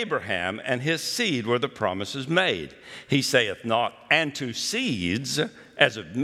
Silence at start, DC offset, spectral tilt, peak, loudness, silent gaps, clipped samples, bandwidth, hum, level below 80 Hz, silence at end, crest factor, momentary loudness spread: 0 s; under 0.1%; -3.5 dB/octave; -2 dBFS; -25 LUFS; none; under 0.1%; 16.5 kHz; none; -66 dBFS; 0 s; 24 dB; 6 LU